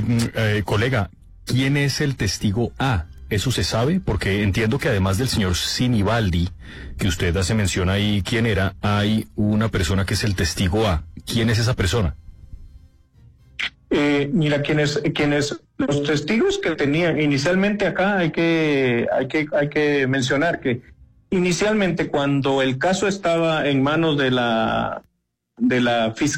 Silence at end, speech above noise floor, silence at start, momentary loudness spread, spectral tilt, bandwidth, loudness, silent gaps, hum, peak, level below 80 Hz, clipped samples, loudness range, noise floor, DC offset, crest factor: 0 s; 38 dB; 0 s; 6 LU; -5.5 dB/octave; 16 kHz; -20 LUFS; none; none; -10 dBFS; -40 dBFS; under 0.1%; 3 LU; -58 dBFS; under 0.1%; 12 dB